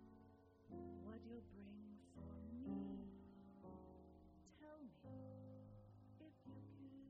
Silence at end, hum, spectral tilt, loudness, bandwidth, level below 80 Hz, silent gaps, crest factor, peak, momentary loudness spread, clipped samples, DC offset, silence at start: 0 s; none; -9 dB/octave; -58 LUFS; 5.4 kHz; -72 dBFS; none; 18 dB; -38 dBFS; 14 LU; under 0.1%; under 0.1%; 0 s